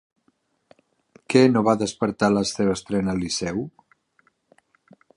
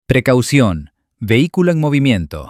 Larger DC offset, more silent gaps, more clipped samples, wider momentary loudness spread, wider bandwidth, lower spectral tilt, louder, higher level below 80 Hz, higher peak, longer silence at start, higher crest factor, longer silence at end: neither; neither; neither; first, 10 LU vs 6 LU; second, 11 kHz vs 15.5 kHz; about the same, -5.5 dB/octave vs -6.5 dB/octave; second, -22 LUFS vs -14 LUFS; second, -54 dBFS vs -38 dBFS; about the same, -2 dBFS vs 0 dBFS; first, 1.3 s vs 0.1 s; first, 22 dB vs 14 dB; first, 1.5 s vs 0 s